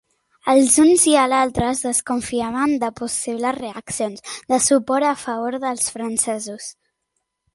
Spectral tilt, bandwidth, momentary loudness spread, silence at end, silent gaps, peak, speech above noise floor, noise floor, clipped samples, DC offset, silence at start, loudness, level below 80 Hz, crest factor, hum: -3 dB/octave; 12 kHz; 15 LU; 0.85 s; none; -2 dBFS; 56 dB; -75 dBFS; under 0.1%; under 0.1%; 0.45 s; -19 LUFS; -50 dBFS; 18 dB; none